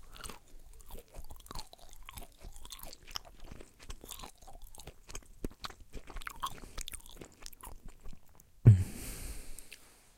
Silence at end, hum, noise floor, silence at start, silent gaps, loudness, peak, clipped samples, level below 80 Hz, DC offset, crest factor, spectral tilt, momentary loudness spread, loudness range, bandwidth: 0.3 s; none; -56 dBFS; 0.05 s; none; -35 LUFS; -8 dBFS; under 0.1%; -48 dBFS; under 0.1%; 28 dB; -5.5 dB/octave; 17 LU; 16 LU; 17 kHz